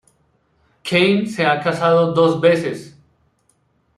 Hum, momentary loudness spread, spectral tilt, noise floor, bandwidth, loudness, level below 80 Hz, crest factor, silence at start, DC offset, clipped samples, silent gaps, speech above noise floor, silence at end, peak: none; 11 LU; -6 dB/octave; -62 dBFS; 12 kHz; -16 LUFS; -58 dBFS; 18 dB; 0.85 s; under 0.1%; under 0.1%; none; 47 dB; 1.1 s; -2 dBFS